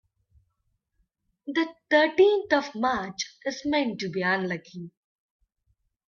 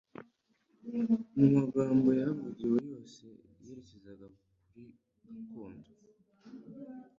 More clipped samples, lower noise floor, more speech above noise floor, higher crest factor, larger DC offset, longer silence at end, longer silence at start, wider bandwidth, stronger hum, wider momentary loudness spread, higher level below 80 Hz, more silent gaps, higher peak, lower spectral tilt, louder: neither; about the same, -76 dBFS vs -74 dBFS; first, 51 dB vs 41 dB; about the same, 20 dB vs 22 dB; neither; first, 1.2 s vs 0.15 s; first, 1.45 s vs 0.2 s; about the same, 7.2 kHz vs 7.4 kHz; neither; second, 17 LU vs 26 LU; about the same, -66 dBFS vs -70 dBFS; neither; first, -8 dBFS vs -12 dBFS; second, -4.5 dB/octave vs -9.5 dB/octave; first, -25 LUFS vs -30 LUFS